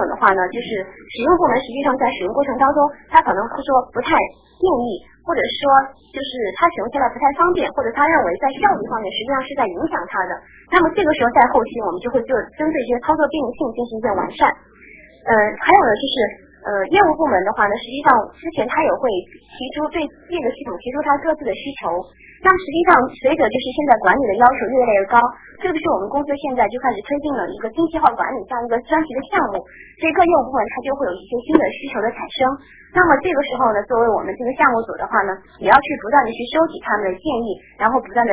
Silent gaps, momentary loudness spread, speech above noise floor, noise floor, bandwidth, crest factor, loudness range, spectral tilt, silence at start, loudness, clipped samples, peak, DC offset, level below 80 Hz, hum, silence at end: none; 10 LU; 27 dB; -44 dBFS; 4 kHz; 18 dB; 4 LU; -8.5 dB/octave; 0 s; -18 LUFS; under 0.1%; 0 dBFS; under 0.1%; -48 dBFS; none; 0 s